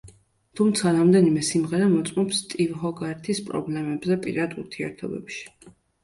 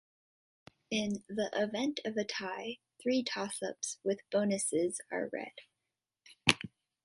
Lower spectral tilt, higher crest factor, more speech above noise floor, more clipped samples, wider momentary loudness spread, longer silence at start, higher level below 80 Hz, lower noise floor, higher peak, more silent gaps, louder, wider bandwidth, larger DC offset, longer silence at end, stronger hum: first, -5.5 dB/octave vs -3.5 dB/octave; second, 18 dB vs 32 dB; second, 31 dB vs 54 dB; neither; first, 15 LU vs 9 LU; second, 0.05 s vs 0.9 s; first, -60 dBFS vs -72 dBFS; second, -54 dBFS vs -89 dBFS; about the same, -6 dBFS vs -4 dBFS; neither; first, -24 LUFS vs -35 LUFS; about the same, 11.5 kHz vs 11.5 kHz; neither; about the same, 0.35 s vs 0.4 s; neither